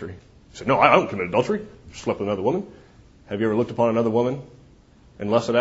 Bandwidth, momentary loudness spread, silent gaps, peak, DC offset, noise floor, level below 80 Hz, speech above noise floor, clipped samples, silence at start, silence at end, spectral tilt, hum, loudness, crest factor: 8 kHz; 17 LU; none; -2 dBFS; under 0.1%; -52 dBFS; -54 dBFS; 30 dB; under 0.1%; 0 s; 0 s; -6.5 dB/octave; none; -22 LUFS; 22 dB